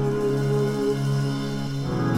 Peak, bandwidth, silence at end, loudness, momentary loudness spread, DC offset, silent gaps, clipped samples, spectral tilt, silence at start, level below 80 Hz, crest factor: -12 dBFS; 13.5 kHz; 0 s; -25 LUFS; 5 LU; under 0.1%; none; under 0.1%; -7 dB/octave; 0 s; -48 dBFS; 12 dB